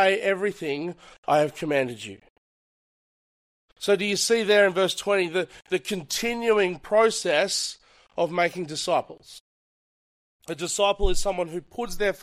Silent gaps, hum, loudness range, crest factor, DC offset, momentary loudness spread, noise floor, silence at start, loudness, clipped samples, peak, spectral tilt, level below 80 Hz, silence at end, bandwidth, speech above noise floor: 1.18-1.23 s, 2.30-3.68 s, 9.40-10.39 s; none; 6 LU; 18 dB; under 0.1%; 12 LU; under -90 dBFS; 0 s; -24 LUFS; under 0.1%; -6 dBFS; -3 dB/octave; -40 dBFS; 0.05 s; 15.5 kHz; over 66 dB